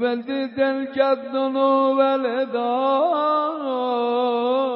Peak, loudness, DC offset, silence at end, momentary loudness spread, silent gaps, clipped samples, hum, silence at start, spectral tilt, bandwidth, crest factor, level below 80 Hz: -6 dBFS; -21 LUFS; under 0.1%; 0 s; 5 LU; none; under 0.1%; none; 0 s; -1.5 dB/octave; 5.6 kHz; 14 dB; -74 dBFS